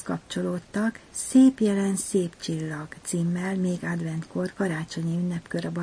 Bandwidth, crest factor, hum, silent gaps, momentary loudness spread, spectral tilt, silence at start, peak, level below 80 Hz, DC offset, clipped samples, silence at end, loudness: 10.5 kHz; 18 dB; none; none; 12 LU; -6 dB/octave; 0 s; -8 dBFS; -60 dBFS; under 0.1%; under 0.1%; 0 s; -26 LUFS